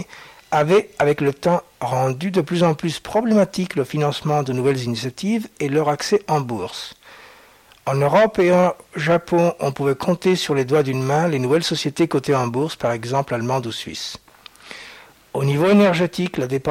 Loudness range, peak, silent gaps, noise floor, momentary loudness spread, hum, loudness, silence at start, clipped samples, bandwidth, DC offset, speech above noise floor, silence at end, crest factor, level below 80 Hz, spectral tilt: 4 LU; -4 dBFS; none; -50 dBFS; 12 LU; none; -20 LUFS; 0 s; under 0.1%; 16.5 kHz; under 0.1%; 31 dB; 0 s; 16 dB; -56 dBFS; -6 dB/octave